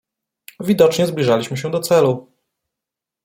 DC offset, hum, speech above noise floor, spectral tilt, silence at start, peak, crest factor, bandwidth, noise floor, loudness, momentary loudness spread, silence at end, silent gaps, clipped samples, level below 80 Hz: under 0.1%; none; 69 dB; -5.5 dB/octave; 0.6 s; 0 dBFS; 18 dB; 16.5 kHz; -85 dBFS; -17 LUFS; 9 LU; 1.05 s; none; under 0.1%; -60 dBFS